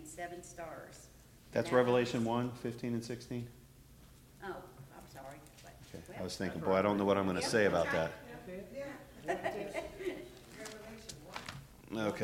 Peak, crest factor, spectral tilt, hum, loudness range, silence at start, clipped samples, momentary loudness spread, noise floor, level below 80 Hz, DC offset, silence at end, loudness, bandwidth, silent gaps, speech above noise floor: -14 dBFS; 22 dB; -5.5 dB/octave; none; 11 LU; 0 s; under 0.1%; 21 LU; -59 dBFS; -62 dBFS; under 0.1%; 0 s; -36 LUFS; 16.5 kHz; none; 24 dB